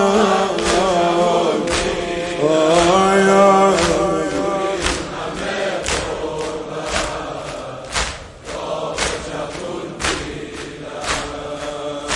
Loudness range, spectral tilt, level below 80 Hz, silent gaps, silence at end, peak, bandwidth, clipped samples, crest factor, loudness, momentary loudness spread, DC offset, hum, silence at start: 9 LU; -4 dB/octave; -38 dBFS; none; 0 s; -2 dBFS; 11.5 kHz; under 0.1%; 18 dB; -18 LUFS; 14 LU; under 0.1%; none; 0 s